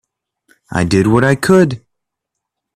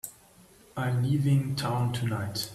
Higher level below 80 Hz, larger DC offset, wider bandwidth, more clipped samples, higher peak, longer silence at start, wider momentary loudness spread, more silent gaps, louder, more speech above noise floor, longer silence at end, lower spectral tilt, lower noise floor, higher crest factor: first, -44 dBFS vs -58 dBFS; neither; about the same, 14.5 kHz vs 15 kHz; neither; first, 0 dBFS vs -14 dBFS; first, 0.7 s vs 0.05 s; about the same, 11 LU vs 10 LU; neither; first, -13 LUFS vs -28 LUFS; first, 67 dB vs 29 dB; first, 1 s vs 0 s; about the same, -6.5 dB/octave vs -6 dB/octave; first, -78 dBFS vs -56 dBFS; about the same, 16 dB vs 14 dB